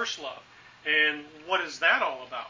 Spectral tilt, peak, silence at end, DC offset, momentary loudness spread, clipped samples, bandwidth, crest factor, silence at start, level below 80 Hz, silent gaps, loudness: -1 dB/octave; -8 dBFS; 0 s; under 0.1%; 15 LU; under 0.1%; 7.6 kHz; 20 dB; 0 s; -72 dBFS; none; -26 LUFS